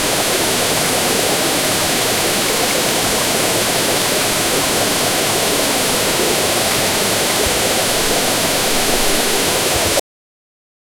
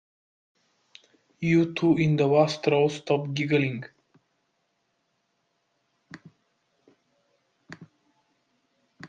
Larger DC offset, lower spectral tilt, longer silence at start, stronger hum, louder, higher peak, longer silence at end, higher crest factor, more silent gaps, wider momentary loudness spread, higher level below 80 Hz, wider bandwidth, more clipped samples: neither; second, -1.5 dB/octave vs -7 dB/octave; second, 0 s vs 1.4 s; neither; first, -14 LUFS vs -24 LUFS; first, -2 dBFS vs -8 dBFS; first, 1 s vs 0 s; second, 14 dB vs 20 dB; neither; second, 0 LU vs 9 LU; first, -38 dBFS vs -68 dBFS; first, over 20 kHz vs 9 kHz; neither